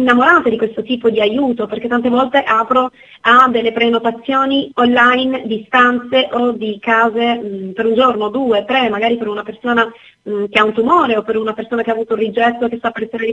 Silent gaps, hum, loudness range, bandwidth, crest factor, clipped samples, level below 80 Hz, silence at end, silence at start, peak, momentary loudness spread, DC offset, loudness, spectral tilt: none; none; 3 LU; 9 kHz; 14 dB; under 0.1%; -54 dBFS; 0 s; 0 s; 0 dBFS; 10 LU; under 0.1%; -14 LUFS; -5.5 dB/octave